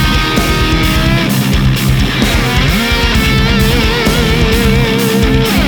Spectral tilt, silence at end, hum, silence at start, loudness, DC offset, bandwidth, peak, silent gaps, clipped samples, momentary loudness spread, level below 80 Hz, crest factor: -5 dB/octave; 0 s; none; 0 s; -11 LUFS; 0.1%; over 20 kHz; 0 dBFS; none; under 0.1%; 1 LU; -16 dBFS; 10 dB